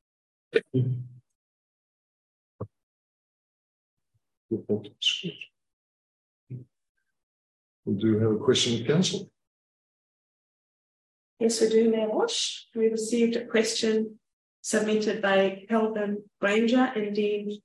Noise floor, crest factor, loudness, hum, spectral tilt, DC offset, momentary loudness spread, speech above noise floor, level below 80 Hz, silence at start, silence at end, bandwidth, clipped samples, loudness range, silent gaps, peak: under -90 dBFS; 20 dB; -26 LUFS; none; -4.5 dB/octave; under 0.1%; 18 LU; over 64 dB; -68 dBFS; 0.55 s; 0.05 s; 12.5 kHz; under 0.1%; 9 LU; 1.35-2.59 s, 2.83-3.97 s, 4.37-4.49 s, 5.73-6.47 s, 6.89-6.95 s, 7.23-7.83 s, 9.47-11.37 s, 14.33-14.63 s; -8 dBFS